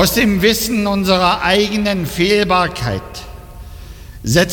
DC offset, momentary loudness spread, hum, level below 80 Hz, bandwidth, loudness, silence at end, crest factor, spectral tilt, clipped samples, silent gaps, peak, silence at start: under 0.1%; 22 LU; none; -34 dBFS; 17.5 kHz; -15 LUFS; 0 s; 14 dB; -4.5 dB/octave; under 0.1%; none; -2 dBFS; 0 s